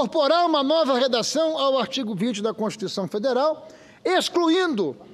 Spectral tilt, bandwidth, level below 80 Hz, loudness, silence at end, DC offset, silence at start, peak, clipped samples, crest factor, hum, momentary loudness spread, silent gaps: -4 dB/octave; 14.5 kHz; -72 dBFS; -22 LUFS; 0 s; under 0.1%; 0 s; -8 dBFS; under 0.1%; 16 dB; none; 8 LU; none